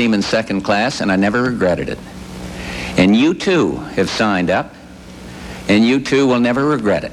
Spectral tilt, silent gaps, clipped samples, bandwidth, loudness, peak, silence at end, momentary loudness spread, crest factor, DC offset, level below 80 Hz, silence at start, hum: -5.5 dB/octave; none; under 0.1%; 13 kHz; -16 LUFS; -2 dBFS; 0 s; 18 LU; 14 dB; under 0.1%; -40 dBFS; 0 s; none